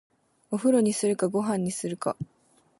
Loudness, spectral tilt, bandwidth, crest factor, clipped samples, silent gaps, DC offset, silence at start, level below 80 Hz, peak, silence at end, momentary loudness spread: -26 LUFS; -5.5 dB/octave; 11.5 kHz; 16 dB; under 0.1%; none; under 0.1%; 0.5 s; -68 dBFS; -12 dBFS; 0.55 s; 12 LU